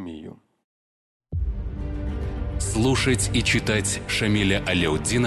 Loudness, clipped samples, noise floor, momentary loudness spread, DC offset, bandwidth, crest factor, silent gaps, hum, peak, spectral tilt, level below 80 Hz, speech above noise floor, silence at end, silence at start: -23 LUFS; under 0.1%; under -90 dBFS; 11 LU; under 0.1%; 12.5 kHz; 16 dB; 0.64-1.20 s; none; -8 dBFS; -4 dB/octave; -32 dBFS; over 68 dB; 0 s; 0 s